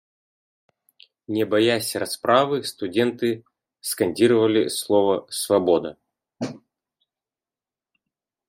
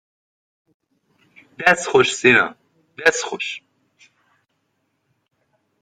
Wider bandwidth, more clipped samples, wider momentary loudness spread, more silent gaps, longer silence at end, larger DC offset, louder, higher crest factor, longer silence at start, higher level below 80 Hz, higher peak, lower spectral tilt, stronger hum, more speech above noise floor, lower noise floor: first, 16 kHz vs 12.5 kHz; neither; about the same, 14 LU vs 13 LU; neither; second, 1.9 s vs 2.25 s; neither; second, -21 LUFS vs -17 LUFS; about the same, 20 dB vs 22 dB; second, 1.3 s vs 1.6 s; second, -70 dBFS vs -62 dBFS; second, -4 dBFS vs 0 dBFS; first, -4.5 dB/octave vs -3 dB/octave; neither; first, over 69 dB vs 53 dB; first, under -90 dBFS vs -71 dBFS